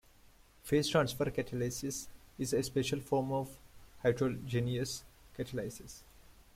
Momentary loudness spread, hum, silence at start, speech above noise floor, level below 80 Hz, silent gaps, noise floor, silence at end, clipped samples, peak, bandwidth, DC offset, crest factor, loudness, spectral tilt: 17 LU; none; 0.25 s; 27 dB; -58 dBFS; none; -62 dBFS; 0.35 s; under 0.1%; -14 dBFS; 16.5 kHz; under 0.1%; 22 dB; -35 LUFS; -5 dB/octave